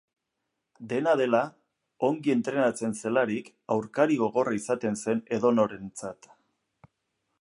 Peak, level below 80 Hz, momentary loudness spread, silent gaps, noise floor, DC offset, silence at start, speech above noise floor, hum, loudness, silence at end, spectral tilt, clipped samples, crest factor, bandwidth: -8 dBFS; -72 dBFS; 12 LU; none; -82 dBFS; under 0.1%; 0.8 s; 56 dB; none; -27 LUFS; 1.3 s; -5.5 dB/octave; under 0.1%; 20 dB; 11.5 kHz